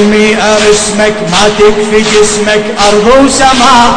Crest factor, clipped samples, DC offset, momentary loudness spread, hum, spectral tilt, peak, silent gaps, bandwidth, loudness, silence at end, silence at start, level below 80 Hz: 6 dB; 8%; under 0.1%; 4 LU; none; -3 dB/octave; 0 dBFS; none; 11 kHz; -6 LUFS; 0 s; 0 s; -28 dBFS